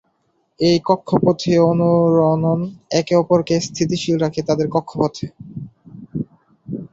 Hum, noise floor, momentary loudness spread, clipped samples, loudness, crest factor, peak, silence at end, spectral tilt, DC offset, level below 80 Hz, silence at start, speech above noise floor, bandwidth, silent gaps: none; -65 dBFS; 17 LU; under 0.1%; -17 LUFS; 16 dB; -2 dBFS; 0.05 s; -6.5 dB/octave; under 0.1%; -52 dBFS; 0.6 s; 49 dB; 7.8 kHz; none